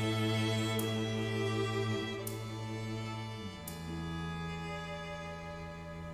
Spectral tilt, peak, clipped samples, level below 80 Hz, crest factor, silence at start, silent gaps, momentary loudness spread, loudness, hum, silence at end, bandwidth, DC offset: -5.5 dB/octave; -22 dBFS; under 0.1%; -56 dBFS; 16 dB; 0 s; none; 11 LU; -37 LUFS; none; 0 s; 16 kHz; under 0.1%